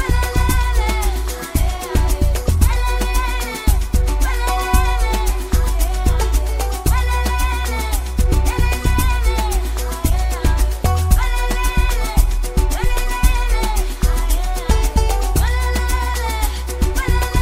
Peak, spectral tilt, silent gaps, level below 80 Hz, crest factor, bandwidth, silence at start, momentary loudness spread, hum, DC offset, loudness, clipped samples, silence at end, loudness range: 0 dBFS; -4.5 dB/octave; none; -16 dBFS; 16 dB; 16 kHz; 0 s; 4 LU; none; under 0.1%; -19 LUFS; under 0.1%; 0 s; 1 LU